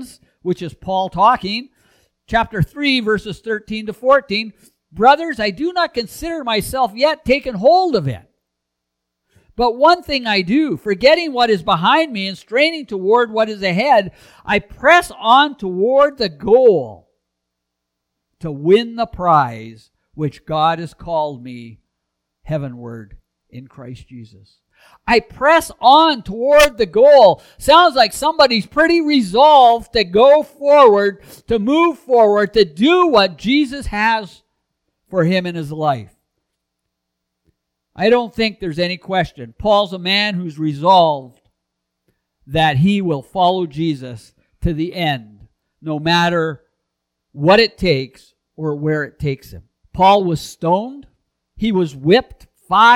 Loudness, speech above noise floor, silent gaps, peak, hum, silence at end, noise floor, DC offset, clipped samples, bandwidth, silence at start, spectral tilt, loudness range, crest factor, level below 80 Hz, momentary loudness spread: -15 LUFS; 62 dB; none; 0 dBFS; none; 0 s; -77 dBFS; under 0.1%; under 0.1%; 18 kHz; 0 s; -5.5 dB/octave; 10 LU; 16 dB; -42 dBFS; 14 LU